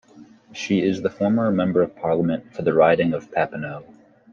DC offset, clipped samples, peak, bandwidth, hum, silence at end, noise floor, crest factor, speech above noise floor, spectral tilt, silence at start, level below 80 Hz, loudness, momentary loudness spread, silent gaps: under 0.1%; under 0.1%; -4 dBFS; 7.4 kHz; none; 0.5 s; -48 dBFS; 18 dB; 27 dB; -7 dB/octave; 0.15 s; -60 dBFS; -21 LUFS; 15 LU; none